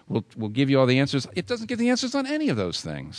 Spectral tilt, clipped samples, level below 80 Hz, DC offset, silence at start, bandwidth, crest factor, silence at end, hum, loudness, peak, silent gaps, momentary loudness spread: -5.5 dB/octave; under 0.1%; -58 dBFS; under 0.1%; 0.1 s; 11 kHz; 18 dB; 0 s; none; -24 LUFS; -6 dBFS; none; 10 LU